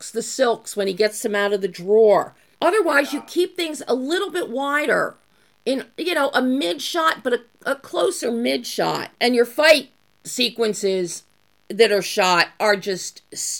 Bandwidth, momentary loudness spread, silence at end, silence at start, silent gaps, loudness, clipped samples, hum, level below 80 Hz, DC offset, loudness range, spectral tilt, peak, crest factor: 17.5 kHz; 11 LU; 0 s; 0 s; none; -20 LUFS; under 0.1%; none; -72 dBFS; under 0.1%; 3 LU; -2.5 dB/octave; -2 dBFS; 20 dB